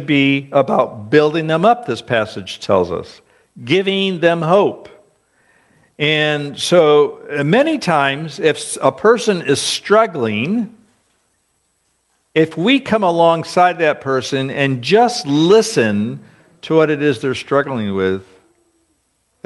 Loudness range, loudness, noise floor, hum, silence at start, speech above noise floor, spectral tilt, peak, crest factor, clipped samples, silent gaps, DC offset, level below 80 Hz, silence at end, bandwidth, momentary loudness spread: 4 LU; -15 LUFS; -64 dBFS; none; 0 s; 49 dB; -5 dB/octave; 0 dBFS; 16 dB; under 0.1%; none; under 0.1%; -58 dBFS; 1.25 s; 11.5 kHz; 8 LU